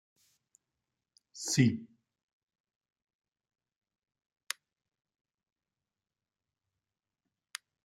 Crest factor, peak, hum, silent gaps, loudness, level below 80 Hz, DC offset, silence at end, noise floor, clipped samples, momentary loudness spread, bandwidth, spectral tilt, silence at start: 30 dB; -12 dBFS; none; none; -32 LUFS; -78 dBFS; under 0.1%; 6 s; under -90 dBFS; under 0.1%; 19 LU; 16 kHz; -4.5 dB/octave; 1.35 s